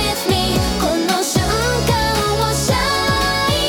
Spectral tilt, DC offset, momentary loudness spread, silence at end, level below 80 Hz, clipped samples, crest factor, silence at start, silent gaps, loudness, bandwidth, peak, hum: -4 dB/octave; under 0.1%; 1 LU; 0 s; -28 dBFS; under 0.1%; 14 dB; 0 s; none; -17 LUFS; 18 kHz; -2 dBFS; none